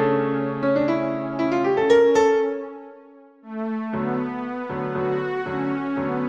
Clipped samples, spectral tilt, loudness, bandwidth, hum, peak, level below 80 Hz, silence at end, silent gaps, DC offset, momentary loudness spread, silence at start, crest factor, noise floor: under 0.1%; -6.5 dB/octave; -22 LUFS; 8.2 kHz; none; -6 dBFS; -58 dBFS; 0 s; none; under 0.1%; 12 LU; 0 s; 16 dB; -48 dBFS